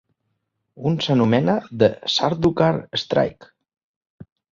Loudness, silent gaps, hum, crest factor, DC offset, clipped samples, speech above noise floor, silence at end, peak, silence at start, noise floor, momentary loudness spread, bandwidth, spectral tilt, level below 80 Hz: -20 LUFS; 3.84-4.01 s, 4.10-4.18 s; none; 20 dB; under 0.1%; under 0.1%; 55 dB; 0.3 s; -2 dBFS; 0.75 s; -75 dBFS; 7 LU; 7.6 kHz; -6.5 dB/octave; -54 dBFS